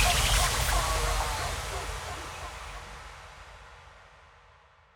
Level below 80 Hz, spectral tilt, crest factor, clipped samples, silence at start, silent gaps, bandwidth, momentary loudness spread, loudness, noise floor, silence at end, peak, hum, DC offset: -36 dBFS; -2 dB/octave; 20 dB; under 0.1%; 0 s; none; 19.5 kHz; 24 LU; -29 LUFS; -58 dBFS; 0.9 s; -12 dBFS; none; under 0.1%